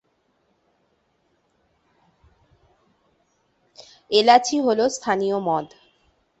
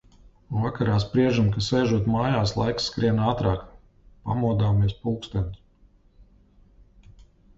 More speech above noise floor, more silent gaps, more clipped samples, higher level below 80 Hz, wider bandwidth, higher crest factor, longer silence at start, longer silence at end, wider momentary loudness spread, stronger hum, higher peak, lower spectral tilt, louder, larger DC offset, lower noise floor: first, 48 dB vs 34 dB; neither; neither; second, -68 dBFS vs -42 dBFS; about the same, 8.2 kHz vs 7.8 kHz; first, 22 dB vs 16 dB; first, 3.8 s vs 0.5 s; first, 0.75 s vs 0.45 s; about the same, 10 LU vs 8 LU; neither; first, -2 dBFS vs -8 dBFS; second, -3.5 dB/octave vs -7 dB/octave; first, -20 LUFS vs -24 LUFS; neither; first, -67 dBFS vs -57 dBFS